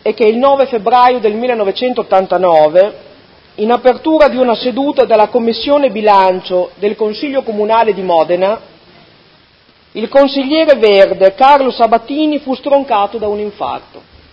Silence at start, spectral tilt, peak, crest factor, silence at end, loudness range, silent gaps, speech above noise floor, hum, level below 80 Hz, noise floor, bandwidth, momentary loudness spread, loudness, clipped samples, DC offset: 0.05 s; -7 dB/octave; 0 dBFS; 12 dB; 0.35 s; 4 LU; none; 37 dB; none; -48 dBFS; -47 dBFS; 6.2 kHz; 9 LU; -11 LUFS; 0.5%; under 0.1%